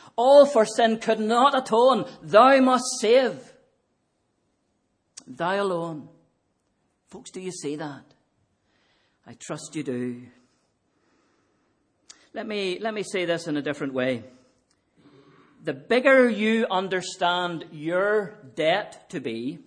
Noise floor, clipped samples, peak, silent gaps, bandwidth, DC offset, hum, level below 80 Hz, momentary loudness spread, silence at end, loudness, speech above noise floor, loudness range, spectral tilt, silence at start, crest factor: -72 dBFS; under 0.1%; -4 dBFS; none; 10.5 kHz; under 0.1%; none; -76 dBFS; 19 LU; 0.1 s; -22 LUFS; 50 dB; 17 LU; -4 dB/octave; 0.2 s; 22 dB